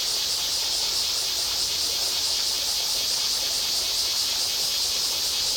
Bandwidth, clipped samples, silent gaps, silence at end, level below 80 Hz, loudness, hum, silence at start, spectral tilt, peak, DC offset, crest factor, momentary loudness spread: over 20 kHz; under 0.1%; none; 0 s; -54 dBFS; -22 LUFS; none; 0 s; 1.5 dB/octave; -12 dBFS; under 0.1%; 14 dB; 1 LU